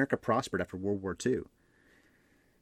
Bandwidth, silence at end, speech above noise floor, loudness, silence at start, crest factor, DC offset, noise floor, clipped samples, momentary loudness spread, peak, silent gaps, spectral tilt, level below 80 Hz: 14.5 kHz; 1.15 s; 35 dB; -33 LUFS; 0 s; 20 dB; under 0.1%; -67 dBFS; under 0.1%; 6 LU; -14 dBFS; none; -5.5 dB/octave; -66 dBFS